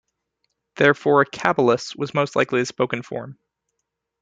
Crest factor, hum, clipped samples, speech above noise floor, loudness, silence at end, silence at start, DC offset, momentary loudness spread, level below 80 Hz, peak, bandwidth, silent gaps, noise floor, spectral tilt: 20 dB; none; under 0.1%; 59 dB; -20 LUFS; 0.9 s; 0.75 s; under 0.1%; 12 LU; -64 dBFS; -2 dBFS; 9 kHz; none; -79 dBFS; -5.5 dB/octave